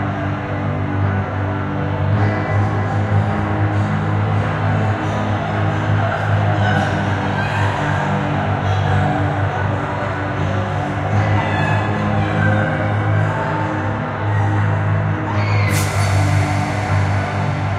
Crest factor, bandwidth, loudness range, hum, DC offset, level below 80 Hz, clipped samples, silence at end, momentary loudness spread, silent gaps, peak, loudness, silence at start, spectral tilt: 14 dB; 13 kHz; 1 LU; none; under 0.1%; -40 dBFS; under 0.1%; 0 s; 4 LU; none; -4 dBFS; -18 LUFS; 0 s; -7 dB/octave